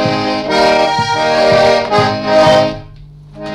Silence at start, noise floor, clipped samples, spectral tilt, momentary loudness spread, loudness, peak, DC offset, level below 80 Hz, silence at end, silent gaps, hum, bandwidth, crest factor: 0 s; -35 dBFS; under 0.1%; -5 dB/octave; 7 LU; -11 LUFS; 0 dBFS; under 0.1%; -40 dBFS; 0 s; none; none; 12 kHz; 12 dB